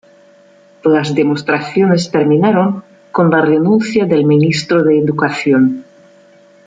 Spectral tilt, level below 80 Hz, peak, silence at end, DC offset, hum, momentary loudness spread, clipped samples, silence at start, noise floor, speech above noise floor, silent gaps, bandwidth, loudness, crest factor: -7 dB/octave; -56 dBFS; -2 dBFS; 0.85 s; under 0.1%; none; 5 LU; under 0.1%; 0.85 s; -46 dBFS; 34 dB; none; 9.2 kHz; -13 LUFS; 12 dB